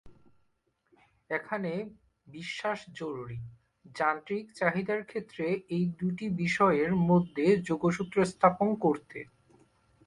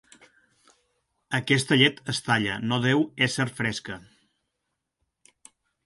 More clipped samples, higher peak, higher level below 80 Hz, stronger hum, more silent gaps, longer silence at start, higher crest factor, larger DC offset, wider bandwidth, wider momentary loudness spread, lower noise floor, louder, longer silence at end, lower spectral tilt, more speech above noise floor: neither; second, -8 dBFS vs -4 dBFS; about the same, -64 dBFS vs -62 dBFS; neither; neither; second, 0.05 s vs 1.3 s; about the same, 22 dB vs 24 dB; neither; about the same, 11 kHz vs 11.5 kHz; first, 17 LU vs 11 LU; second, -75 dBFS vs -81 dBFS; second, -30 LUFS vs -24 LUFS; second, 0.8 s vs 1.85 s; first, -7 dB/octave vs -4.5 dB/octave; second, 45 dB vs 56 dB